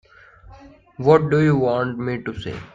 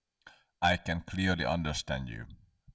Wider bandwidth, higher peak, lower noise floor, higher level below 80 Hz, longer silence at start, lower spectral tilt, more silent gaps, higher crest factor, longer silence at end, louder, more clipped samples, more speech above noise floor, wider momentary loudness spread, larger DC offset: about the same, 7.6 kHz vs 8 kHz; first, 0 dBFS vs -16 dBFS; second, -47 dBFS vs -60 dBFS; about the same, -50 dBFS vs -46 dBFS; first, 0.45 s vs 0.25 s; first, -8.5 dB/octave vs -5 dB/octave; neither; about the same, 20 dB vs 18 dB; about the same, 0.1 s vs 0.05 s; first, -19 LUFS vs -32 LUFS; neither; about the same, 28 dB vs 28 dB; about the same, 13 LU vs 14 LU; neither